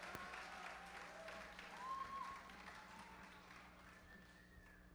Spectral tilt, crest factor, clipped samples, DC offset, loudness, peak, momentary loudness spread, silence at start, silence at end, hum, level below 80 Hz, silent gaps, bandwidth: -3 dB/octave; 28 dB; under 0.1%; under 0.1%; -54 LUFS; -28 dBFS; 13 LU; 0 s; 0 s; 60 Hz at -70 dBFS; -72 dBFS; none; over 20 kHz